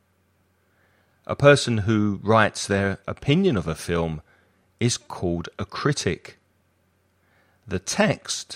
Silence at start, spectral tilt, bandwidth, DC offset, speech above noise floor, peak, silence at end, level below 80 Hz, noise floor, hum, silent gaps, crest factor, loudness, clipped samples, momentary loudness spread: 1.3 s; -5 dB/octave; 15 kHz; under 0.1%; 43 dB; -2 dBFS; 0 s; -50 dBFS; -66 dBFS; none; none; 22 dB; -23 LUFS; under 0.1%; 13 LU